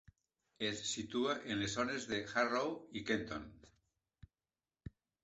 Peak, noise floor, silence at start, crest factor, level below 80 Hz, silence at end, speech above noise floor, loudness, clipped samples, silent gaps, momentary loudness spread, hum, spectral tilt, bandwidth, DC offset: -20 dBFS; under -90 dBFS; 0.6 s; 20 dB; -66 dBFS; 0.35 s; over 51 dB; -39 LUFS; under 0.1%; none; 21 LU; none; -3.5 dB/octave; 8.2 kHz; under 0.1%